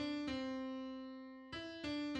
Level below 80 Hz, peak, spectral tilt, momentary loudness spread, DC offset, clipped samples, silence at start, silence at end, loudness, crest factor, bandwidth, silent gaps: -68 dBFS; -30 dBFS; -5 dB/octave; 9 LU; under 0.1%; under 0.1%; 0 s; 0 s; -45 LUFS; 14 dB; 9.4 kHz; none